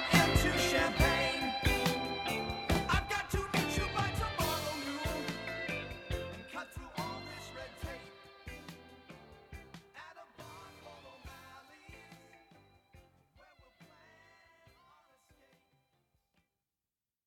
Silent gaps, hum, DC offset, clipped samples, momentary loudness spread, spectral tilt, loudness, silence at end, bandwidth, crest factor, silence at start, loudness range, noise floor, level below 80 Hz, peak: none; none; under 0.1%; under 0.1%; 24 LU; -4 dB/octave; -34 LUFS; 3.4 s; 19 kHz; 24 dB; 0 s; 22 LU; under -90 dBFS; -46 dBFS; -12 dBFS